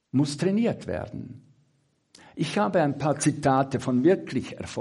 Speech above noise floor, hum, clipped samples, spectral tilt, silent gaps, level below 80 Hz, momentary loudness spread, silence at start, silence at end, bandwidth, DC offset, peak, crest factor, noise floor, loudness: 44 dB; none; under 0.1%; -6 dB/octave; none; -60 dBFS; 13 LU; 0.15 s; 0 s; 11.5 kHz; under 0.1%; -10 dBFS; 16 dB; -69 dBFS; -25 LUFS